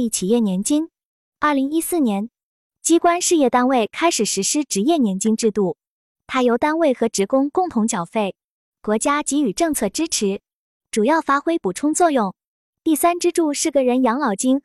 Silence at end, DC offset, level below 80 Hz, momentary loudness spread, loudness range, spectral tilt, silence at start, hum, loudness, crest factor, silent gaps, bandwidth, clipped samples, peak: 0.05 s; under 0.1%; -58 dBFS; 8 LU; 3 LU; -4 dB/octave; 0 s; none; -19 LUFS; 14 dB; 1.05-1.32 s, 2.43-2.70 s, 5.87-6.15 s, 8.44-8.72 s, 10.55-10.80 s, 12.47-12.73 s; 13.5 kHz; under 0.1%; -6 dBFS